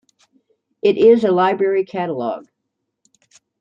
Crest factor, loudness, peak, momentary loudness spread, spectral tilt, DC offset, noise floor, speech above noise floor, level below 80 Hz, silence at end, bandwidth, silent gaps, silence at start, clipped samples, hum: 16 dB; -16 LUFS; -2 dBFS; 13 LU; -7 dB/octave; under 0.1%; -76 dBFS; 61 dB; -66 dBFS; 1.2 s; 7.4 kHz; none; 0.85 s; under 0.1%; none